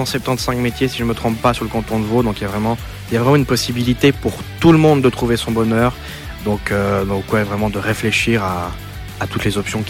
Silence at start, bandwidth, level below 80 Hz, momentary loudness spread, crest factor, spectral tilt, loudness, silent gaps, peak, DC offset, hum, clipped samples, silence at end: 0 s; 16.5 kHz; -34 dBFS; 10 LU; 14 dB; -5.5 dB/octave; -17 LUFS; none; -2 dBFS; under 0.1%; none; under 0.1%; 0 s